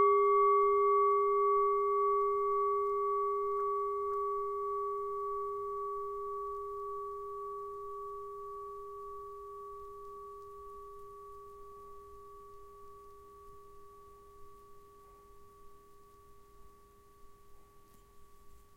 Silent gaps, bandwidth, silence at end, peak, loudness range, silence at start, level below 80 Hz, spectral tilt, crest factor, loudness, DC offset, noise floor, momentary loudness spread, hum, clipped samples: none; 3.5 kHz; 0.2 s; -18 dBFS; 25 LU; 0 s; -64 dBFS; -6.5 dB/octave; 16 dB; -33 LUFS; under 0.1%; -60 dBFS; 25 LU; none; under 0.1%